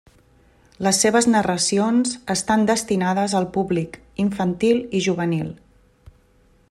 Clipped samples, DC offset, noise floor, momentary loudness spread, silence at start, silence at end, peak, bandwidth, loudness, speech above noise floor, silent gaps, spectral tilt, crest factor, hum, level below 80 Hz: under 0.1%; under 0.1%; -57 dBFS; 8 LU; 0.8 s; 1.15 s; -4 dBFS; 13.5 kHz; -20 LUFS; 37 dB; none; -4.5 dB/octave; 16 dB; none; -54 dBFS